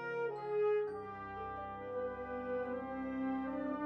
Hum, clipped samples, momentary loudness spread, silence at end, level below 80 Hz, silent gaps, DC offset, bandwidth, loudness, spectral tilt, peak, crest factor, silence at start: none; under 0.1%; 10 LU; 0 s; -64 dBFS; none; under 0.1%; 5.8 kHz; -40 LUFS; -8.5 dB/octave; -26 dBFS; 12 dB; 0 s